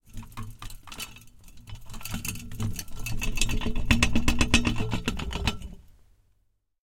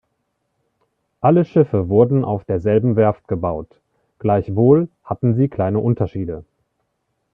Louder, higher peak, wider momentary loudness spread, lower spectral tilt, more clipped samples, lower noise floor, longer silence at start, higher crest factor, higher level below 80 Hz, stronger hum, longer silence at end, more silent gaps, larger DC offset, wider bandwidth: second, -28 LUFS vs -18 LUFS; second, -4 dBFS vs 0 dBFS; first, 20 LU vs 11 LU; second, -4 dB/octave vs -12 dB/octave; neither; about the same, -70 dBFS vs -72 dBFS; second, 0.1 s vs 1.25 s; first, 24 dB vs 18 dB; first, -34 dBFS vs -50 dBFS; neither; about the same, 0.95 s vs 0.9 s; neither; neither; first, 17 kHz vs 3.8 kHz